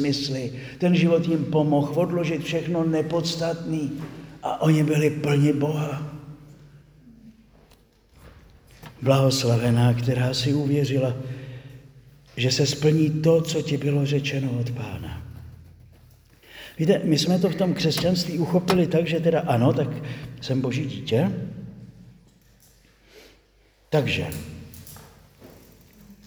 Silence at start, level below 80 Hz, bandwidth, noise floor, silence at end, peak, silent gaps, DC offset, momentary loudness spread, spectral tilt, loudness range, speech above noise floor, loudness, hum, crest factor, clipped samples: 0 s; -54 dBFS; over 20 kHz; -59 dBFS; 0.15 s; -4 dBFS; none; under 0.1%; 17 LU; -6 dB/octave; 9 LU; 37 dB; -23 LUFS; none; 20 dB; under 0.1%